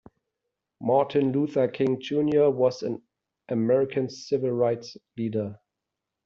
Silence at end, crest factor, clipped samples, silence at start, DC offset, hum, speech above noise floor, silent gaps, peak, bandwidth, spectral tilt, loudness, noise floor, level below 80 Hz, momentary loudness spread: 0.7 s; 16 dB; under 0.1%; 0.8 s; under 0.1%; none; 61 dB; none; -10 dBFS; 7.4 kHz; -6.5 dB/octave; -26 LUFS; -85 dBFS; -68 dBFS; 11 LU